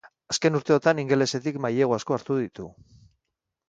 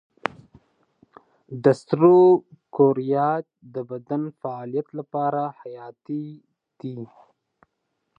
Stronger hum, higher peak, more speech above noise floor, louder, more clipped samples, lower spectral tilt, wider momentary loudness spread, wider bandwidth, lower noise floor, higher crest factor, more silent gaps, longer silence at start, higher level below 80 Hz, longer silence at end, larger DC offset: neither; second, -6 dBFS vs -2 dBFS; first, 59 dB vs 55 dB; about the same, -24 LUFS vs -22 LUFS; neither; second, -5 dB/octave vs -9 dB/octave; second, 10 LU vs 23 LU; about the same, 9.4 kHz vs 8.6 kHz; first, -83 dBFS vs -77 dBFS; about the same, 20 dB vs 22 dB; neither; second, 0.3 s vs 1.5 s; first, -64 dBFS vs -72 dBFS; second, 1 s vs 1.15 s; neither